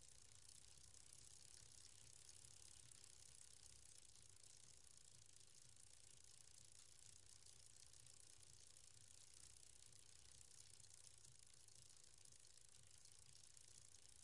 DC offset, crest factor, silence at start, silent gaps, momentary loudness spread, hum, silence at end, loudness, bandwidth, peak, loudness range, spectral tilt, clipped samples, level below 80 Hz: under 0.1%; 26 dB; 0 s; none; 3 LU; none; 0 s; -65 LUFS; 12 kHz; -44 dBFS; 2 LU; -1 dB/octave; under 0.1%; -82 dBFS